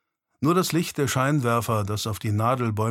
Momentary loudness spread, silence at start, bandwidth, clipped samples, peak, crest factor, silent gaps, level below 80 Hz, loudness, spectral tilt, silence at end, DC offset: 5 LU; 0.4 s; 16.5 kHz; under 0.1%; -8 dBFS; 16 dB; none; -58 dBFS; -24 LUFS; -5.5 dB/octave; 0 s; under 0.1%